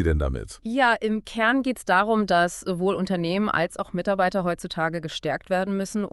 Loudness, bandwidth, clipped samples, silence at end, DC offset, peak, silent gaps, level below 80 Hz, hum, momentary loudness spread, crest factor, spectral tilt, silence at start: -24 LUFS; 12 kHz; under 0.1%; 0.05 s; under 0.1%; -6 dBFS; none; -38 dBFS; none; 8 LU; 18 dB; -5.5 dB/octave; 0 s